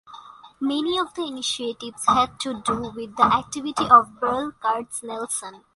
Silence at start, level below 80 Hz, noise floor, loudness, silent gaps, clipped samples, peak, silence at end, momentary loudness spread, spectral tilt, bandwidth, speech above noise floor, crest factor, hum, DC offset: 0.1 s; -56 dBFS; -44 dBFS; -23 LUFS; none; under 0.1%; -2 dBFS; 0.2 s; 14 LU; -3 dB/octave; 11.5 kHz; 21 dB; 22 dB; none; under 0.1%